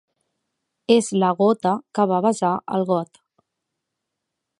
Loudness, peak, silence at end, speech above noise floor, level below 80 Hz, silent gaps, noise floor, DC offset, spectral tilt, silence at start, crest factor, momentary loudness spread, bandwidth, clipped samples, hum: -20 LUFS; -2 dBFS; 1.55 s; 61 dB; -72 dBFS; none; -81 dBFS; under 0.1%; -6 dB/octave; 0.9 s; 20 dB; 6 LU; 11.5 kHz; under 0.1%; none